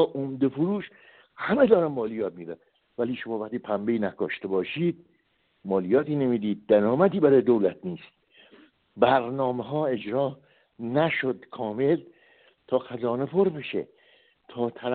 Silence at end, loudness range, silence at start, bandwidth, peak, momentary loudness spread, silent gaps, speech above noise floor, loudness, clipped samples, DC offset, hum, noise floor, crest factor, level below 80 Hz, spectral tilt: 0 s; 6 LU; 0 s; 4.5 kHz; -6 dBFS; 16 LU; none; 44 dB; -26 LUFS; under 0.1%; under 0.1%; none; -69 dBFS; 20 dB; -66 dBFS; -5.5 dB/octave